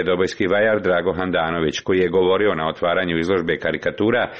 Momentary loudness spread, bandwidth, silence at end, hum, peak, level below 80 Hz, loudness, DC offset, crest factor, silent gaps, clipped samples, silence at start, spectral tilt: 4 LU; 7.6 kHz; 0 s; none; -6 dBFS; -48 dBFS; -19 LUFS; 0.1%; 12 dB; none; under 0.1%; 0 s; -3.5 dB/octave